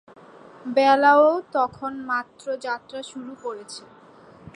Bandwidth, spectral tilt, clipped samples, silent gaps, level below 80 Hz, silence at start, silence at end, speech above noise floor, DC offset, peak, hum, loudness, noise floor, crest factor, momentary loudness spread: 10.5 kHz; -4 dB/octave; under 0.1%; none; -68 dBFS; 0.65 s; 0.75 s; 27 dB; under 0.1%; -4 dBFS; none; -21 LUFS; -49 dBFS; 18 dB; 21 LU